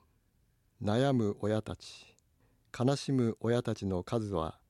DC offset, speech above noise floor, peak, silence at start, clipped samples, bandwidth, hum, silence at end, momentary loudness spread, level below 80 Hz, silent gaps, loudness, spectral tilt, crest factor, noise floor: under 0.1%; 40 dB; -16 dBFS; 0.8 s; under 0.1%; 12 kHz; none; 0.15 s; 16 LU; -60 dBFS; none; -32 LUFS; -7 dB/octave; 18 dB; -72 dBFS